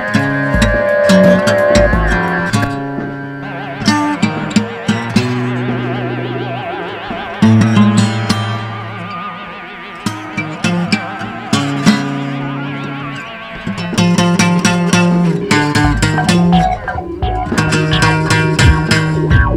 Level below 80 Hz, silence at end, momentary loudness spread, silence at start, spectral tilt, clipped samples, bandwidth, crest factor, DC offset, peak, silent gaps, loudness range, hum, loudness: -26 dBFS; 0 s; 13 LU; 0 s; -5.5 dB/octave; under 0.1%; 15 kHz; 14 dB; under 0.1%; 0 dBFS; none; 5 LU; none; -14 LUFS